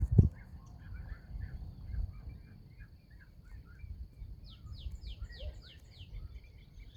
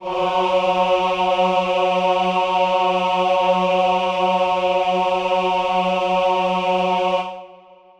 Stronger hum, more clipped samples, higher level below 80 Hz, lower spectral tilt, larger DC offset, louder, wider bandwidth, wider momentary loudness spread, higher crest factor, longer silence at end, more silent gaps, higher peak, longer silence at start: neither; neither; first, -44 dBFS vs -54 dBFS; first, -9 dB/octave vs -5 dB/octave; neither; second, -41 LUFS vs -18 LUFS; second, 7.6 kHz vs 9.6 kHz; first, 13 LU vs 2 LU; first, 28 dB vs 12 dB; second, 0 s vs 0.45 s; neither; second, -10 dBFS vs -6 dBFS; about the same, 0 s vs 0 s